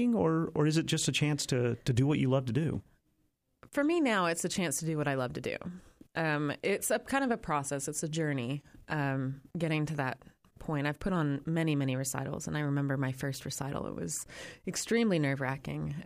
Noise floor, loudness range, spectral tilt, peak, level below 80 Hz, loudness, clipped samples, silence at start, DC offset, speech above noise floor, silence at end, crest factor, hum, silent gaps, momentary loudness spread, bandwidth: -76 dBFS; 3 LU; -5 dB/octave; -16 dBFS; -58 dBFS; -32 LUFS; under 0.1%; 0 s; under 0.1%; 44 dB; 0 s; 16 dB; none; none; 9 LU; 15.5 kHz